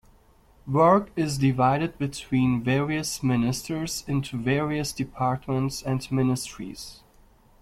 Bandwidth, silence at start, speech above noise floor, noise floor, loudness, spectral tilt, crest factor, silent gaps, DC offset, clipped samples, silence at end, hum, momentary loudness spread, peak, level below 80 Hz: 15.5 kHz; 0.65 s; 32 dB; -57 dBFS; -25 LUFS; -6 dB/octave; 18 dB; none; under 0.1%; under 0.1%; 0.65 s; none; 10 LU; -6 dBFS; -50 dBFS